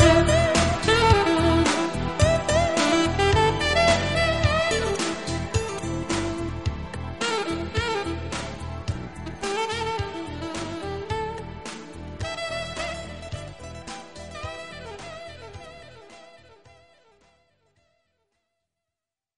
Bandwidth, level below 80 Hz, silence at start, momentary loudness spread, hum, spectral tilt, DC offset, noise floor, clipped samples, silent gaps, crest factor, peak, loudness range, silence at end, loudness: 11.5 kHz; -38 dBFS; 0 s; 18 LU; none; -4.5 dB/octave; 0.3%; -88 dBFS; under 0.1%; none; 22 dB; -2 dBFS; 18 LU; 2.85 s; -24 LUFS